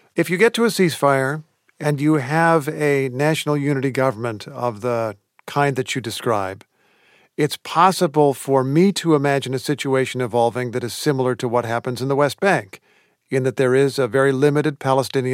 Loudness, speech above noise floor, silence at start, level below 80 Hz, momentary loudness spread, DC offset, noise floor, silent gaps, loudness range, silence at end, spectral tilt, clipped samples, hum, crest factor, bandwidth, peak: -19 LUFS; 38 dB; 0.15 s; -72 dBFS; 8 LU; under 0.1%; -57 dBFS; none; 4 LU; 0 s; -5.5 dB/octave; under 0.1%; none; 18 dB; 16.5 kHz; -2 dBFS